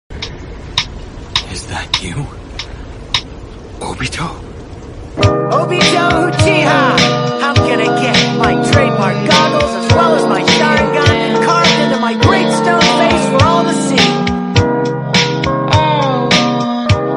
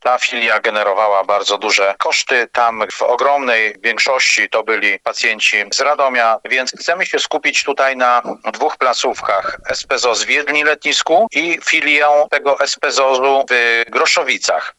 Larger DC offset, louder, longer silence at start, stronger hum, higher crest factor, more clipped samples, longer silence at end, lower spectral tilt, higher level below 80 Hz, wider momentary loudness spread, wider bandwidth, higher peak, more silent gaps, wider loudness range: neither; about the same, -12 LUFS vs -14 LUFS; about the same, 0.1 s vs 0.05 s; neither; about the same, 12 dB vs 14 dB; neither; about the same, 0 s vs 0.1 s; first, -5 dB/octave vs 0 dB/octave; first, -32 dBFS vs -58 dBFS; first, 16 LU vs 5 LU; about the same, 11.5 kHz vs 12 kHz; about the same, 0 dBFS vs 0 dBFS; neither; first, 10 LU vs 3 LU